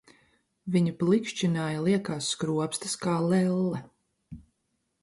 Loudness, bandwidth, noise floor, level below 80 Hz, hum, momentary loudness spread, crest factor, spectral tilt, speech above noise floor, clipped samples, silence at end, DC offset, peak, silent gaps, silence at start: -28 LUFS; 11.5 kHz; -77 dBFS; -64 dBFS; none; 6 LU; 16 dB; -5.5 dB/octave; 51 dB; under 0.1%; 0.6 s; under 0.1%; -12 dBFS; none; 0.65 s